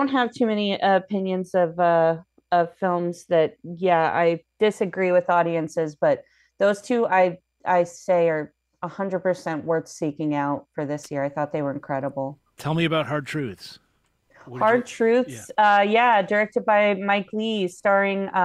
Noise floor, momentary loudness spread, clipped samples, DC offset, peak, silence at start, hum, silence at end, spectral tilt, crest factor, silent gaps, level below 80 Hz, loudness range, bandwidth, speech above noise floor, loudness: -66 dBFS; 11 LU; under 0.1%; under 0.1%; -6 dBFS; 0 s; none; 0 s; -6 dB/octave; 16 dB; none; -68 dBFS; 7 LU; 12.5 kHz; 44 dB; -23 LUFS